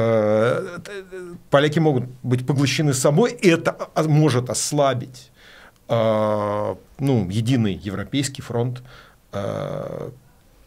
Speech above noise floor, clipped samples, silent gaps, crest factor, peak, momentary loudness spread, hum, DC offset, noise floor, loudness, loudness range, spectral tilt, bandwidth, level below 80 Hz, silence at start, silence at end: 27 dB; under 0.1%; none; 20 dB; -2 dBFS; 16 LU; none; under 0.1%; -48 dBFS; -21 LUFS; 5 LU; -5.5 dB/octave; 16 kHz; -54 dBFS; 0 s; 0.55 s